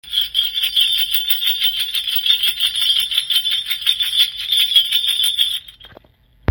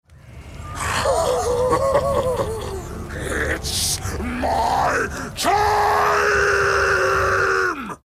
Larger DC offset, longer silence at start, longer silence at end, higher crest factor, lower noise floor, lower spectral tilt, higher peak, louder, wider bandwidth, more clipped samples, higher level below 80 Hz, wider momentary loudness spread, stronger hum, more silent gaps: neither; about the same, 0.05 s vs 0.1 s; first, 0.65 s vs 0.1 s; about the same, 18 dB vs 14 dB; first, -52 dBFS vs -40 dBFS; second, 0 dB/octave vs -3.5 dB/octave; first, 0 dBFS vs -6 dBFS; first, -15 LUFS vs -19 LUFS; about the same, 17 kHz vs 16 kHz; neither; second, -52 dBFS vs -36 dBFS; second, 5 LU vs 11 LU; neither; neither